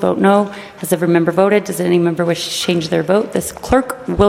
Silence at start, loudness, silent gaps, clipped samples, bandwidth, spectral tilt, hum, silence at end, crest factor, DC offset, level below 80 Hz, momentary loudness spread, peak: 0 s; -16 LUFS; none; under 0.1%; 16.5 kHz; -5.5 dB/octave; none; 0 s; 14 dB; under 0.1%; -38 dBFS; 8 LU; 0 dBFS